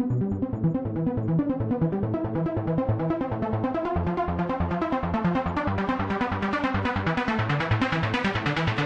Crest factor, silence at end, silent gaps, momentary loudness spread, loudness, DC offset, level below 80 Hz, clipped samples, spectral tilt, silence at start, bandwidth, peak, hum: 14 dB; 0 s; none; 3 LU; -26 LUFS; under 0.1%; -44 dBFS; under 0.1%; -8 dB/octave; 0 s; 8.2 kHz; -10 dBFS; none